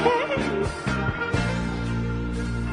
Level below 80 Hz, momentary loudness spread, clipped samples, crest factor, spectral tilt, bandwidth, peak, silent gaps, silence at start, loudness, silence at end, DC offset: -34 dBFS; 5 LU; under 0.1%; 18 dB; -6.5 dB/octave; 11 kHz; -6 dBFS; none; 0 s; -26 LUFS; 0 s; under 0.1%